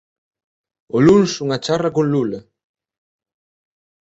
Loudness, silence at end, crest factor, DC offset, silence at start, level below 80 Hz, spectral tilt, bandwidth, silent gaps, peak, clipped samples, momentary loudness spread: -17 LUFS; 1.65 s; 18 dB; under 0.1%; 0.95 s; -52 dBFS; -6 dB/octave; 8.2 kHz; none; -2 dBFS; under 0.1%; 12 LU